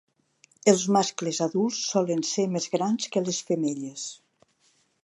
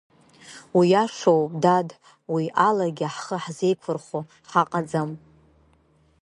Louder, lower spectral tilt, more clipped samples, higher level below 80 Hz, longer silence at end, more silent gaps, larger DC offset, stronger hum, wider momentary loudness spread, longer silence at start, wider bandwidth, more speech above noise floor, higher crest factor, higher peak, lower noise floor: second, -26 LUFS vs -23 LUFS; second, -4.5 dB/octave vs -6 dB/octave; neither; second, -78 dBFS vs -68 dBFS; second, 0.9 s vs 1.05 s; neither; neither; neither; second, 9 LU vs 14 LU; first, 0.65 s vs 0.45 s; about the same, 11.5 kHz vs 11 kHz; first, 42 dB vs 38 dB; about the same, 22 dB vs 20 dB; about the same, -4 dBFS vs -4 dBFS; first, -67 dBFS vs -61 dBFS